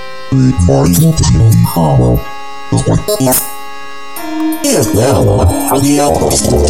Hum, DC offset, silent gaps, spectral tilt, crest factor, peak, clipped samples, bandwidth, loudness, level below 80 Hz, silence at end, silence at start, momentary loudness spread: none; 5%; none; -5.5 dB/octave; 10 dB; 0 dBFS; under 0.1%; 17.5 kHz; -10 LUFS; -24 dBFS; 0 s; 0 s; 15 LU